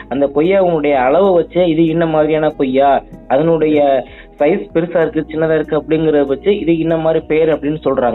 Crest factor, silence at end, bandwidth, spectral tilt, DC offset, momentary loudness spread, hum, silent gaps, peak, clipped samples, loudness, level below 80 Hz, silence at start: 12 dB; 0 s; 4.1 kHz; -10 dB/octave; under 0.1%; 5 LU; none; none; -2 dBFS; under 0.1%; -14 LUFS; -40 dBFS; 0 s